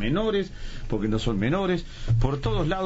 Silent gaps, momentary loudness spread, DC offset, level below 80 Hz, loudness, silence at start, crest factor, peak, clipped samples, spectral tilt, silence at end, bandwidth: none; 7 LU; under 0.1%; -32 dBFS; -26 LUFS; 0 s; 14 dB; -10 dBFS; under 0.1%; -6 dB/octave; 0 s; 8 kHz